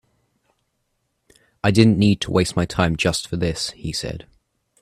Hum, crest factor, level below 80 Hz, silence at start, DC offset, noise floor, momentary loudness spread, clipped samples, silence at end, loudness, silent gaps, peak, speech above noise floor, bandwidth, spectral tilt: none; 22 dB; -44 dBFS; 1.65 s; under 0.1%; -72 dBFS; 12 LU; under 0.1%; 0.6 s; -20 LUFS; none; 0 dBFS; 53 dB; 14.5 kHz; -5.5 dB/octave